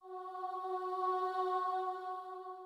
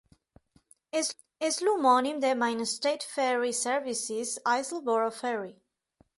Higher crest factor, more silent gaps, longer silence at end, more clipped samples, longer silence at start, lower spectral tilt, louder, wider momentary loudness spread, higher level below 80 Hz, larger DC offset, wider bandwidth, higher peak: about the same, 14 dB vs 18 dB; neither; second, 0 s vs 0.65 s; neither; second, 0 s vs 0.95 s; first, -3 dB/octave vs -1.5 dB/octave; second, -38 LUFS vs -29 LUFS; about the same, 9 LU vs 9 LU; second, under -90 dBFS vs -76 dBFS; neither; about the same, 12.5 kHz vs 12 kHz; second, -26 dBFS vs -12 dBFS